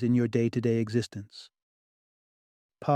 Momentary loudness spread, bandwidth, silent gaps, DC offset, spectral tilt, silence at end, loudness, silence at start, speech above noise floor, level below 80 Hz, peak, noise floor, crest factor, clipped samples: 19 LU; 10 kHz; 1.62-2.69 s; under 0.1%; -7.5 dB/octave; 0 s; -28 LUFS; 0 s; over 62 dB; -68 dBFS; -12 dBFS; under -90 dBFS; 16 dB; under 0.1%